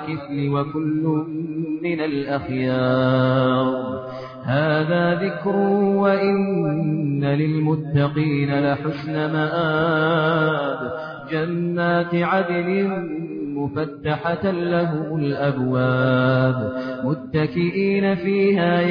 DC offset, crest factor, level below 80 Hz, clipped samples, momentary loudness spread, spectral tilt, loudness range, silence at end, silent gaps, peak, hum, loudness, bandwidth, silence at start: under 0.1%; 14 dB; -56 dBFS; under 0.1%; 8 LU; -10 dB/octave; 3 LU; 0 s; none; -6 dBFS; none; -21 LUFS; 5.2 kHz; 0 s